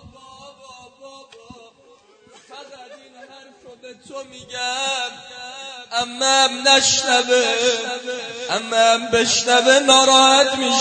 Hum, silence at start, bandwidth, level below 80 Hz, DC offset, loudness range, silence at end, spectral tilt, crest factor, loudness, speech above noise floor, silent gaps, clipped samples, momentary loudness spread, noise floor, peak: none; 0.05 s; 9.4 kHz; -60 dBFS; under 0.1%; 14 LU; 0 s; -0.5 dB/octave; 20 dB; -15 LUFS; 35 dB; none; under 0.1%; 22 LU; -52 dBFS; 0 dBFS